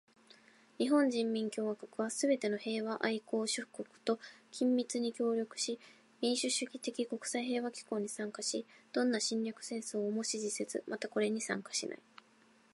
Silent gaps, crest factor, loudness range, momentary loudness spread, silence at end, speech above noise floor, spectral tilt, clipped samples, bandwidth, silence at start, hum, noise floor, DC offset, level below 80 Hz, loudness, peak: none; 20 dB; 2 LU; 8 LU; 0.75 s; 31 dB; -3 dB/octave; under 0.1%; 11.5 kHz; 0.8 s; none; -67 dBFS; under 0.1%; -90 dBFS; -36 LUFS; -16 dBFS